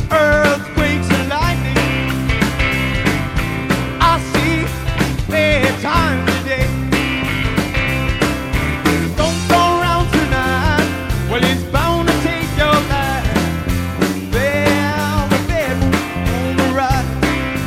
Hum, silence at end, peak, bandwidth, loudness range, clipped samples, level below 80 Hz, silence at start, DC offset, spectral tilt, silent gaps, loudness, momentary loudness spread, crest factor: none; 0 s; -2 dBFS; 16.5 kHz; 1 LU; under 0.1%; -26 dBFS; 0 s; under 0.1%; -5.5 dB/octave; none; -16 LUFS; 5 LU; 14 dB